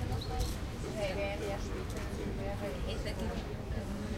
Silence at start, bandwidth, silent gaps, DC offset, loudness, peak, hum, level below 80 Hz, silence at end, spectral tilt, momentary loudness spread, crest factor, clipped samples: 0 s; 16 kHz; none; under 0.1%; -38 LUFS; -22 dBFS; none; -42 dBFS; 0 s; -5.5 dB/octave; 4 LU; 14 dB; under 0.1%